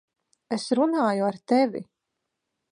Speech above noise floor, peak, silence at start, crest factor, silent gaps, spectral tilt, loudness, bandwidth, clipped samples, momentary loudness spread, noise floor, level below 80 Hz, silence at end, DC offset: 58 dB; -10 dBFS; 0.5 s; 16 dB; none; -5.5 dB/octave; -24 LUFS; 10.5 kHz; under 0.1%; 9 LU; -82 dBFS; -78 dBFS; 0.9 s; under 0.1%